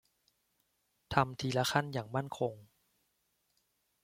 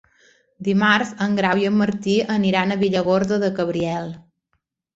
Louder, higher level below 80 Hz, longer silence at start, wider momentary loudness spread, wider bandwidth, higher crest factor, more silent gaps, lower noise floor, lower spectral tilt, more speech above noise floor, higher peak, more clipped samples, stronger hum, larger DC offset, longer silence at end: second, -34 LUFS vs -20 LUFS; second, -64 dBFS vs -56 dBFS; first, 1.1 s vs 0.6 s; about the same, 7 LU vs 7 LU; first, 16.5 kHz vs 8 kHz; first, 28 dB vs 18 dB; neither; first, -79 dBFS vs -73 dBFS; about the same, -5 dB/octave vs -6 dB/octave; second, 45 dB vs 53 dB; second, -10 dBFS vs -2 dBFS; neither; neither; neither; first, 1.4 s vs 0.75 s